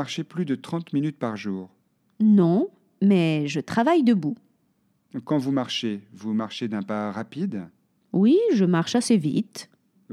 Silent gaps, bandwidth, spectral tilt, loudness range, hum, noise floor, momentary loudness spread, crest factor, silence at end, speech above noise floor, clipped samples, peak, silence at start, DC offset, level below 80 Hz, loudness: none; 12 kHz; -6.5 dB/octave; 6 LU; none; -68 dBFS; 13 LU; 16 dB; 0.5 s; 45 dB; under 0.1%; -8 dBFS; 0 s; under 0.1%; -76 dBFS; -24 LUFS